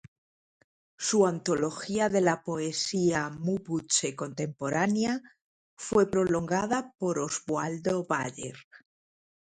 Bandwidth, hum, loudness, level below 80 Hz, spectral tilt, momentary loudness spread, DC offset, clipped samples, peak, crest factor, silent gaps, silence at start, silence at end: 10.5 kHz; none; -29 LUFS; -64 dBFS; -4.5 dB/octave; 9 LU; under 0.1%; under 0.1%; -10 dBFS; 20 dB; 5.44-5.77 s, 8.64-8.71 s; 1 s; 0.75 s